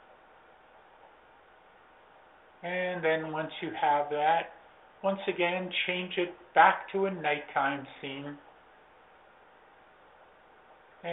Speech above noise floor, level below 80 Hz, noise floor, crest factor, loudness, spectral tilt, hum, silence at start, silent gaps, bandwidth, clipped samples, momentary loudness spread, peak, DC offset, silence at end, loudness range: 29 dB; -76 dBFS; -58 dBFS; 26 dB; -30 LUFS; -2 dB/octave; none; 2.6 s; none; 4 kHz; under 0.1%; 17 LU; -8 dBFS; under 0.1%; 0 s; 10 LU